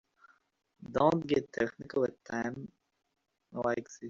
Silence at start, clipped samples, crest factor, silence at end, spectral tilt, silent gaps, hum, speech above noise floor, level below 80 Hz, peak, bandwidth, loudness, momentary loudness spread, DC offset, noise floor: 0.8 s; under 0.1%; 22 dB; 0 s; -5.5 dB/octave; none; none; 33 dB; -66 dBFS; -12 dBFS; 7.8 kHz; -33 LUFS; 18 LU; under 0.1%; -65 dBFS